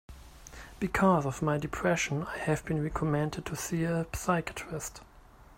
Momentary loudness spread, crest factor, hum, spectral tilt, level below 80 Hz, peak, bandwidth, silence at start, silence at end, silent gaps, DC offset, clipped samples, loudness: 13 LU; 18 dB; none; -5.5 dB/octave; -50 dBFS; -12 dBFS; 16 kHz; 0.1 s; 0.05 s; none; under 0.1%; under 0.1%; -31 LUFS